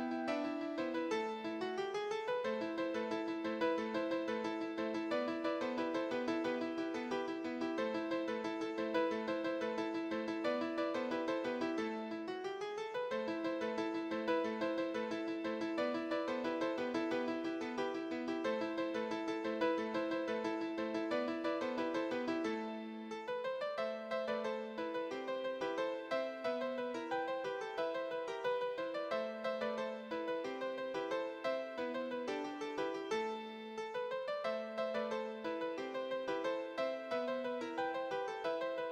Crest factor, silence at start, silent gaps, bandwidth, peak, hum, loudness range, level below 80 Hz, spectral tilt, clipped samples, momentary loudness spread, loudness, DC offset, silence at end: 18 dB; 0 s; none; 9.4 kHz; -22 dBFS; none; 2 LU; -80 dBFS; -5 dB/octave; under 0.1%; 4 LU; -39 LUFS; under 0.1%; 0 s